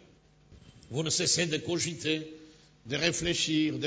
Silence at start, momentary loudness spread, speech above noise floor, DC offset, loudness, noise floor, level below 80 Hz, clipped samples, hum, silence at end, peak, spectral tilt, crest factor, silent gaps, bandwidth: 0.5 s; 10 LU; 30 dB; under 0.1%; -29 LUFS; -60 dBFS; -58 dBFS; under 0.1%; none; 0 s; -12 dBFS; -3 dB/octave; 20 dB; none; 8 kHz